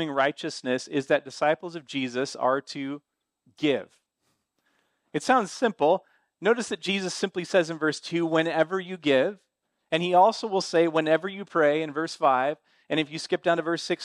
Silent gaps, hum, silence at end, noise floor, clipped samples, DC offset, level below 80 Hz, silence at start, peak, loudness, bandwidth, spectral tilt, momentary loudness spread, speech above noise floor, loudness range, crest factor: none; none; 0 s; -75 dBFS; under 0.1%; under 0.1%; -76 dBFS; 0 s; -8 dBFS; -26 LUFS; 11.5 kHz; -4.5 dB/octave; 8 LU; 50 dB; 6 LU; 18 dB